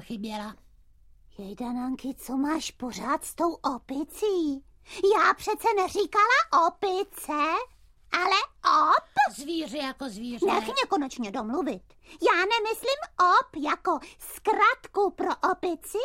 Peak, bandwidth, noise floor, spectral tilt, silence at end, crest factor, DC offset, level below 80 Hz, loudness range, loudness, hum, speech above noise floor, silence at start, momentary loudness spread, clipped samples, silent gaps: -8 dBFS; 16 kHz; -56 dBFS; -3 dB/octave; 0 s; 20 dB; under 0.1%; -58 dBFS; 6 LU; -26 LUFS; none; 29 dB; 0 s; 14 LU; under 0.1%; none